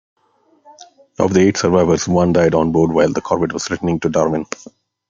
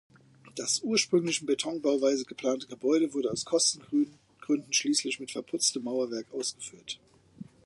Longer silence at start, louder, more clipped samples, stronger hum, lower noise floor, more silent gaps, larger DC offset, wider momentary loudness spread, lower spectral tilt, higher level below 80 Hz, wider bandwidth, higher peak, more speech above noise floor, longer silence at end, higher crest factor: first, 1.2 s vs 0.45 s; first, -16 LUFS vs -29 LUFS; neither; neither; first, -57 dBFS vs -50 dBFS; neither; neither; second, 7 LU vs 11 LU; first, -6 dB/octave vs -2.5 dB/octave; first, -48 dBFS vs -74 dBFS; second, 7.6 kHz vs 11.5 kHz; first, 0 dBFS vs -12 dBFS; first, 42 dB vs 20 dB; first, 0.65 s vs 0.2 s; about the same, 16 dB vs 18 dB